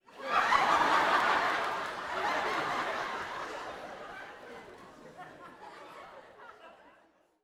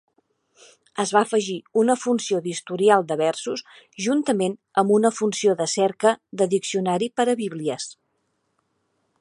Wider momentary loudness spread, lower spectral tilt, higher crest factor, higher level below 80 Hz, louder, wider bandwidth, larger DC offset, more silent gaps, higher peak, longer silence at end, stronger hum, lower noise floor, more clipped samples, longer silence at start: first, 25 LU vs 10 LU; second, -2.5 dB/octave vs -4.5 dB/octave; about the same, 22 dB vs 20 dB; first, -66 dBFS vs -74 dBFS; second, -30 LUFS vs -22 LUFS; first, 17 kHz vs 11.5 kHz; neither; neither; second, -12 dBFS vs -2 dBFS; second, 0.7 s vs 1.25 s; neither; second, -66 dBFS vs -72 dBFS; neither; second, 0.1 s vs 0.95 s